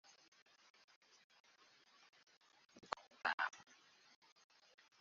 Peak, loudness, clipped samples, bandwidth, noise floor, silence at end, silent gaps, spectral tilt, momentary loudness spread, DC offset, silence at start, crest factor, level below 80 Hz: -22 dBFS; -44 LUFS; under 0.1%; 7.2 kHz; -71 dBFS; 1.4 s; 3.34-3.38 s; 2 dB/octave; 26 LU; under 0.1%; 2.75 s; 32 dB; under -90 dBFS